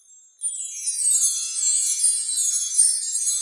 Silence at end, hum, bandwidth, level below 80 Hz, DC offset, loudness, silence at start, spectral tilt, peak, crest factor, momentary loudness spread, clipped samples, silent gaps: 0 s; none; 11.5 kHz; under -90 dBFS; under 0.1%; -19 LUFS; 0.4 s; 11 dB/octave; -6 dBFS; 18 dB; 10 LU; under 0.1%; none